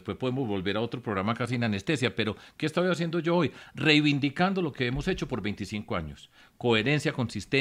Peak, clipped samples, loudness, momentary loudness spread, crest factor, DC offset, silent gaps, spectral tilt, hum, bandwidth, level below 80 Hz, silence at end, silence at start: -8 dBFS; under 0.1%; -28 LUFS; 9 LU; 20 dB; under 0.1%; none; -6 dB/octave; none; 14 kHz; -52 dBFS; 0 s; 0.05 s